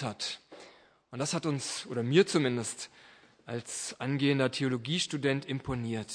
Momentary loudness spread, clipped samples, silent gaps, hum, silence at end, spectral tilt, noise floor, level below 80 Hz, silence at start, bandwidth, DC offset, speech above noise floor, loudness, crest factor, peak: 15 LU; under 0.1%; none; none; 0 s; -4.5 dB/octave; -57 dBFS; -64 dBFS; 0 s; 10.5 kHz; under 0.1%; 26 dB; -31 LUFS; 22 dB; -10 dBFS